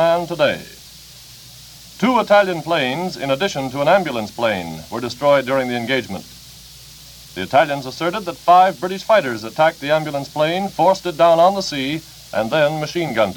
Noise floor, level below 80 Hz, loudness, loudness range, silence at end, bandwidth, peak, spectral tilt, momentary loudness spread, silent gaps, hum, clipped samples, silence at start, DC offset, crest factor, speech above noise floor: -41 dBFS; -52 dBFS; -18 LUFS; 4 LU; 0 s; 19 kHz; 0 dBFS; -4.5 dB/octave; 24 LU; none; none; under 0.1%; 0 s; under 0.1%; 18 dB; 23 dB